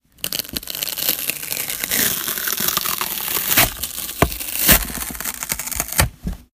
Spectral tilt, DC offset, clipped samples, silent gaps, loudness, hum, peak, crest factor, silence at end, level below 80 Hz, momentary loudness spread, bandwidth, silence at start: -2 dB/octave; under 0.1%; under 0.1%; none; -19 LUFS; none; 0 dBFS; 22 dB; 0.1 s; -34 dBFS; 10 LU; 17 kHz; 0.2 s